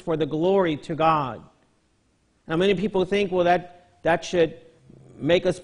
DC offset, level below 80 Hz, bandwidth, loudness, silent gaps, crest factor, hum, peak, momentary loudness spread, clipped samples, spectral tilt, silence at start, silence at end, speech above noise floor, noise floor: under 0.1%; -54 dBFS; 10.5 kHz; -23 LUFS; none; 18 dB; none; -6 dBFS; 8 LU; under 0.1%; -6 dB/octave; 0.05 s; 0 s; 43 dB; -65 dBFS